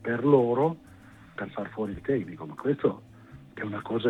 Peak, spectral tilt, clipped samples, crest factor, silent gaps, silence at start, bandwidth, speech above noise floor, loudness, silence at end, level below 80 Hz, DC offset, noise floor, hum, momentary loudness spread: -8 dBFS; -9 dB/octave; under 0.1%; 20 dB; none; 0 s; 4.3 kHz; 24 dB; -28 LUFS; 0 s; -60 dBFS; under 0.1%; -51 dBFS; none; 20 LU